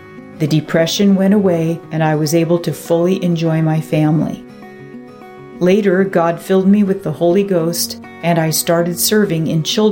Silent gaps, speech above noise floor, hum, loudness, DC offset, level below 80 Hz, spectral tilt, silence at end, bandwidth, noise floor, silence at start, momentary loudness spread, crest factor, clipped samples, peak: none; 21 dB; none; -15 LUFS; under 0.1%; -54 dBFS; -5.5 dB/octave; 0 s; 17 kHz; -35 dBFS; 0 s; 10 LU; 12 dB; under 0.1%; -2 dBFS